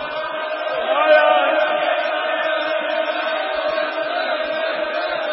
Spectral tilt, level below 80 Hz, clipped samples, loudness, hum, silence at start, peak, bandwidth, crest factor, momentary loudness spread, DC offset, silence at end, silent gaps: -6.5 dB/octave; -64 dBFS; under 0.1%; -19 LUFS; none; 0 s; -2 dBFS; 5.8 kHz; 18 dB; 9 LU; under 0.1%; 0 s; none